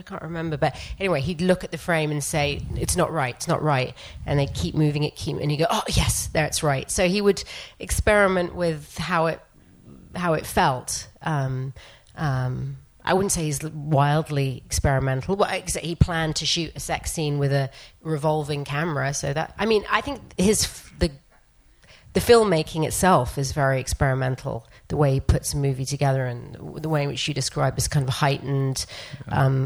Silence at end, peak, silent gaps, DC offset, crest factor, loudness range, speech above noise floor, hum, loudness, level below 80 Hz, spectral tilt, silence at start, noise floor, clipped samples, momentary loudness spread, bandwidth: 0 s; -2 dBFS; none; under 0.1%; 22 dB; 4 LU; 32 dB; none; -24 LUFS; -38 dBFS; -5 dB/octave; 0.05 s; -56 dBFS; under 0.1%; 10 LU; 19.5 kHz